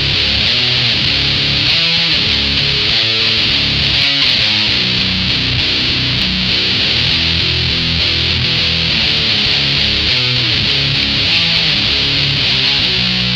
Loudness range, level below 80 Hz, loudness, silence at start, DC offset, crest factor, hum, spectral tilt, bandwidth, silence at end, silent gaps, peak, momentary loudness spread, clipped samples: 1 LU; -30 dBFS; -11 LUFS; 0 s; under 0.1%; 14 dB; none; -3.5 dB/octave; 12.5 kHz; 0 s; none; 0 dBFS; 2 LU; under 0.1%